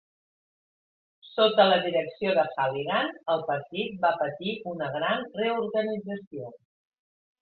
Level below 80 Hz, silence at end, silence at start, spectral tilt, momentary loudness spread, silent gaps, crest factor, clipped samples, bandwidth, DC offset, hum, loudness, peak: -72 dBFS; 0.9 s; 1.25 s; -8.5 dB/octave; 14 LU; 6.27-6.31 s; 22 dB; under 0.1%; 4.6 kHz; under 0.1%; none; -27 LUFS; -6 dBFS